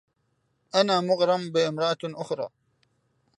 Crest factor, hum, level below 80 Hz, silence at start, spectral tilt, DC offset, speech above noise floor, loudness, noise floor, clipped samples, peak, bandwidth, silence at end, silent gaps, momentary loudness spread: 22 dB; none; -78 dBFS; 0.75 s; -5 dB/octave; under 0.1%; 48 dB; -25 LUFS; -73 dBFS; under 0.1%; -6 dBFS; 11 kHz; 0.9 s; none; 10 LU